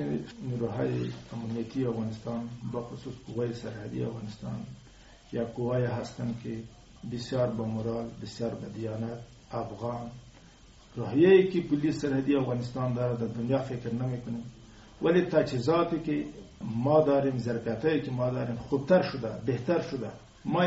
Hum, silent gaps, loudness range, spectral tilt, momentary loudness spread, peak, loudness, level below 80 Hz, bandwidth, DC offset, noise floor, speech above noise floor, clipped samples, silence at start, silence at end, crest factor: none; none; 9 LU; -7 dB/octave; 15 LU; -10 dBFS; -30 LUFS; -56 dBFS; 8 kHz; under 0.1%; -54 dBFS; 25 dB; under 0.1%; 0 s; 0 s; 20 dB